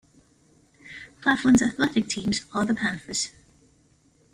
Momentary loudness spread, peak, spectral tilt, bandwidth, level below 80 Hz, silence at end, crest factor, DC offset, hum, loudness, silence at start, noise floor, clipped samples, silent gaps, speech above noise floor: 17 LU; -8 dBFS; -3.5 dB/octave; 12.5 kHz; -56 dBFS; 1.05 s; 18 dB; under 0.1%; none; -24 LUFS; 0.85 s; -61 dBFS; under 0.1%; none; 38 dB